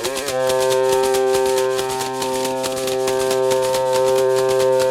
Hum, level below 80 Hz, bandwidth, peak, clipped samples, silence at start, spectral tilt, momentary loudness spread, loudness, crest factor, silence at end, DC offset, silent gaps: none; -52 dBFS; 16.5 kHz; -4 dBFS; under 0.1%; 0 s; -3 dB/octave; 5 LU; -18 LUFS; 14 dB; 0 s; under 0.1%; none